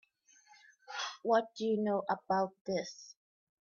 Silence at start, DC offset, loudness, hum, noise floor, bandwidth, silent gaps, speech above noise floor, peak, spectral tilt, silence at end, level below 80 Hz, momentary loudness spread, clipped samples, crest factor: 0.9 s; under 0.1%; -35 LUFS; none; -66 dBFS; 7.2 kHz; 2.61-2.65 s; 32 dB; -18 dBFS; -5 dB/octave; 0.5 s; -80 dBFS; 14 LU; under 0.1%; 18 dB